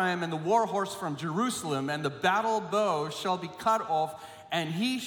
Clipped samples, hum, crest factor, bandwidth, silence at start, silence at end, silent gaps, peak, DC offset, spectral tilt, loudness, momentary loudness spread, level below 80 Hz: under 0.1%; none; 16 dB; 18 kHz; 0 s; 0 s; none; -12 dBFS; under 0.1%; -4.5 dB/octave; -29 LUFS; 6 LU; -74 dBFS